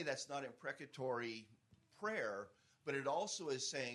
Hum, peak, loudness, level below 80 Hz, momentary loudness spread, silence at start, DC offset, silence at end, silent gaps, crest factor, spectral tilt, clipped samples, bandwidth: none; -26 dBFS; -44 LUFS; -88 dBFS; 9 LU; 0 s; under 0.1%; 0 s; none; 18 dB; -3 dB/octave; under 0.1%; 12 kHz